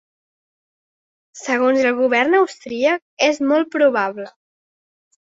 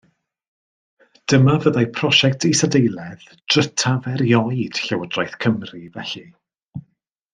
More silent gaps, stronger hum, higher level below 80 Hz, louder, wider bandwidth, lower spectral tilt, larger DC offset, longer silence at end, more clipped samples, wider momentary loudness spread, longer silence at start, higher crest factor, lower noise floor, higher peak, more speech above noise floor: first, 3.02-3.17 s vs 6.65-6.69 s; neither; second, -68 dBFS vs -58 dBFS; about the same, -17 LUFS vs -18 LUFS; second, 7.8 kHz vs 9.8 kHz; second, -3 dB/octave vs -4.5 dB/octave; neither; first, 1 s vs 0.55 s; neither; second, 9 LU vs 20 LU; about the same, 1.35 s vs 1.3 s; about the same, 16 dB vs 20 dB; first, under -90 dBFS vs -66 dBFS; second, -4 dBFS vs 0 dBFS; first, over 73 dB vs 48 dB